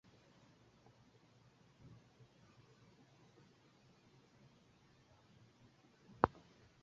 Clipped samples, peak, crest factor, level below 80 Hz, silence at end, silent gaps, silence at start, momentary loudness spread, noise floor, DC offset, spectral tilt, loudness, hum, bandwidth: under 0.1%; -10 dBFS; 42 dB; -70 dBFS; 0.55 s; none; 6.25 s; 25 LU; -69 dBFS; under 0.1%; -5.5 dB/octave; -39 LUFS; none; 7.4 kHz